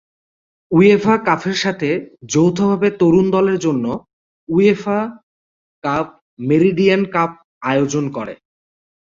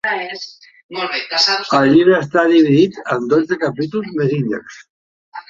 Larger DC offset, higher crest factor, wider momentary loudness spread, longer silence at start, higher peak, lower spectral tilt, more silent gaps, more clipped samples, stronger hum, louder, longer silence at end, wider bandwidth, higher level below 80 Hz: neither; about the same, 16 dB vs 14 dB; second, 13 LU vs 16 LU; first, 0.7 s vs 0.05 s; about the same, -2 dBFS vs -2 dBFS; about the same, -6 dB/octave vs -5.5 dB/octave; first, 4.13-4.47 s, 5.23-5.82 s, 6.21-6.37 s, 7.45-7.61 s vs 0.83-0.89 s, 4.90-5.32 s; neither; neither; about the same, -16 LUFS vs -15 LUFS; first, 0.8 s vs 0.1 s; about the same, 7.6 kHz vs 7.6 kHz; about the same, -54 dBFS vs -58 dBFS